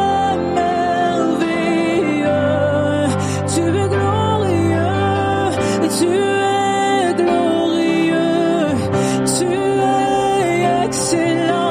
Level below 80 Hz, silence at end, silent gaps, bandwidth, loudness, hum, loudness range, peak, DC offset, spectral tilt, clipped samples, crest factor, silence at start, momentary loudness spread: -46 dBFS; 0 s; none; 15.5 kHz; -16 LUFS; none; 1 LU; -4 dBFS; under 0.1%; -5 dB/octave; under 0.1%; 12 dB; 0 s; 2 LU